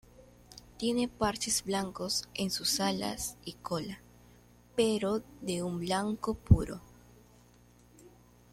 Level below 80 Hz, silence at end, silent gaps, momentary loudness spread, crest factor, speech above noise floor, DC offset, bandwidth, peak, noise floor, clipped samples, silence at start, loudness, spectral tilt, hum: -48 dBFS; 0.45 s; none; 16 LU; 26 dB; 29 dB; under 0.1%; 16 kHz; -8 dBFS; -60 dBFS; under 0.1%; 0.2 s; -32 LUFS; -4.5 dB/octave; 60 Hz at -55 dBFS